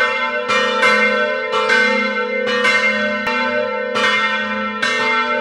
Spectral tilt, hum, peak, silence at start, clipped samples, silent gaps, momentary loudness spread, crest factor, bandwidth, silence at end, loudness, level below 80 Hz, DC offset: -2.5 dB/octave; none; -2 dBFS; 0 s; under 0.1%; none; 5 LU; 16 dB; 12.5 kHz; 0 s; -16 LUFS; -62 dBFS; under 0.1%